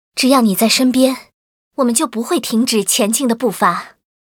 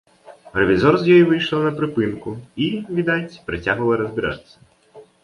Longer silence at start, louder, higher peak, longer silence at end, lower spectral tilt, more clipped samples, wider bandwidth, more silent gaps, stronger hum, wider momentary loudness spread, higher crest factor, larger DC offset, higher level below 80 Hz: about the same, 0.15 s vs 0.25 s; first, -15 LUFS vs -19 LUFS; about the same, 0 dBFS vs -2 dBFS; first, 0.45 s vs 0.2 s; second, -3 dB/octave vs -7.5 dB/octave; neither; first, 20 kHz vs 10.5 kHz; first, 1.34-1.71 s vs none; neither; second, 7 LU vs 14 LU; about the same, 16 dB vs 18 dB; neither; second, -62 dBFS vs -48 dBFS